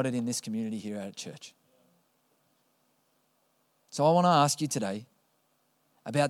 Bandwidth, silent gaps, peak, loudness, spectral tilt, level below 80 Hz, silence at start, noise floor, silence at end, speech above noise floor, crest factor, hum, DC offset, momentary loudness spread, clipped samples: 16 kHz; none; -10 dBFS; -28 LUFS; -5 dB/octave; -82 dBFS; 0 s; -72 dBFS; 0 s; 44 dB; 22 dB; none; under 0.1%; 20 LU; under 0.1%